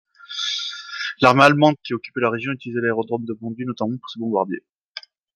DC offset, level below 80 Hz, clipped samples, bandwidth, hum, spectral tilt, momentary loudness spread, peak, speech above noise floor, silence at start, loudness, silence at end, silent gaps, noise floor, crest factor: under 0.1%; -60 dBFS; under 0.1%; 15 kHz; none; -5.5 dB/octave; 19 LU; 0 dBFS; 22 dB; 0.3 s; -21 LUFS; 0.35 s; 4.74-4.95 s; -41 dBFS; 20 dB